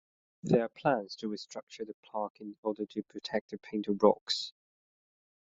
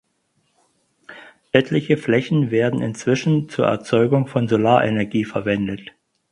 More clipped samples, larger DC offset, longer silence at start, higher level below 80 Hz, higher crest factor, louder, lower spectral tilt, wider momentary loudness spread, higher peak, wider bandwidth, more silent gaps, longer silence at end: neither; neither; second, 0.45 s vs 1.1 s; second, -74 dBFS vs -56 dBFS; about the same, 24 dB vs 20 dB; second, -33 LUFS vs -19 LUFS; second, -4 dB/octave vs -7 dB/octave; first, 16 LU vs 6 LU; second, -10 dBFS vs 0 dBFS; second, 8 kHz vs 11 kHz; first, 1.63-1.67 s, 1.94-2.03 s, 2.30-2.34 s, 2.58-2.63 s, 3.41-3.49 s, 4.21-4.26 s vs none; first, 0.9 s vs 0.5 s